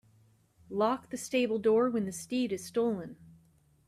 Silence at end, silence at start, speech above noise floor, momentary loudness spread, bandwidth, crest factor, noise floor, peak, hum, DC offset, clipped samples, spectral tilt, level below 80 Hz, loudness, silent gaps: 0.55 s; 0.7 s; 35 dB; 10 LU; 14.5 kHz; 18 dB; -65 dBFS; -14 dBFS; none; under 0.1%; under 0.1%; -5 dB/octave; -72 dBFS; -31 LUFS; none